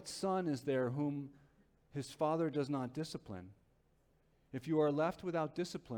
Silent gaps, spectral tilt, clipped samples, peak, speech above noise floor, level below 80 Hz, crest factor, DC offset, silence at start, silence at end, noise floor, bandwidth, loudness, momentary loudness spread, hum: none; -6.5 dB/octave; under 0.1%; -22 dBFS; 35 dB; -72 dBFS; 16 dB; under 0.1%; 0 s; 0 s; -73 dBFS; 18 kHz; -38 LUFS; 14 LU; none